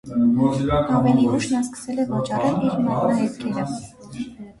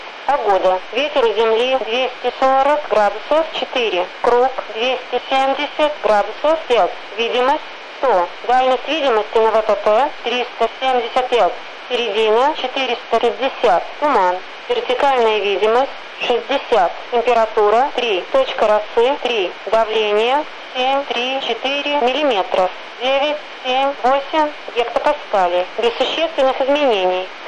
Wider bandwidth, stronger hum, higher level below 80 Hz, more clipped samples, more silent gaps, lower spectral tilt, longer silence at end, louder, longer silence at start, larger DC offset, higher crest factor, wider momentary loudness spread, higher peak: about the same, 11.5 kHz vs 10.5 kHz; neither; first, -44 dBFS vs -56 dBFS; neither; neither; first, -7 dB/octave vs -3 dB/octave; about the same, 0.1 s vs 0 s; second, -21 LUFS vs -17 LUFS; about the same, 0.05 s vs 0 s; neither; about the same, 14 dB vs 12 dB; first, 15 LU vs 5 LU; about the same, -6 dBFS vs -6 dBFS